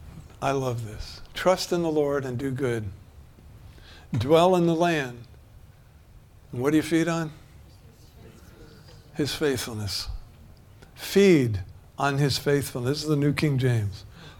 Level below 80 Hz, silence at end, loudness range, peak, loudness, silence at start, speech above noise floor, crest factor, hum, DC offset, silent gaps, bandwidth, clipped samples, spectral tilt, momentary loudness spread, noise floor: -48 dBFS; 0.05 s; 7 LU; -6 dBFS; -25 LUFS; 0 s; 27 dB; 20 dB; none; under 0.1%; none; 18.5 kHz; under 0.1%; -6 dB/octave; 18 LU; -51 dBFS